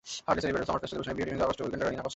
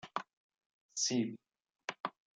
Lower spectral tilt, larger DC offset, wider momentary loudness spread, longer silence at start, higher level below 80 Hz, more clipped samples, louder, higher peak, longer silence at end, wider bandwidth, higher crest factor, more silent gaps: first, -5 dB/octave vs -2.5 dB/octave; neither; second, 5 LU vs 17 LU; about the same, 0.05 s vs 0.05 s; first, -52 dBFS vs -88 dBFS; neither; first, -31 LUFS vs -38 LUFS; first, -12 dBFS vs -20 dBFS; second, 0 s vs 0.3 s; second, 8.2 kHz vs 10.5 kHz; about the same, 20 dB vs 22 dB; second, none vs 0.33-0.49 s, 0.66-0.89 s, 2.00-2.04 s